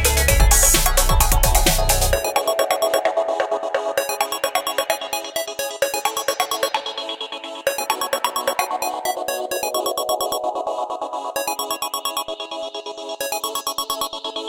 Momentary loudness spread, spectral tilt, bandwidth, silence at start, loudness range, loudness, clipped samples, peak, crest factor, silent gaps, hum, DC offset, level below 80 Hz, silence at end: 10 LU; -2 dB/octave; 17 kHz; 0 s; 7 LU; -21 LUFS; under 0.1%; -2 dBFS; 20 dB; none; none; under 0.1%; -26 dBFS; 0 s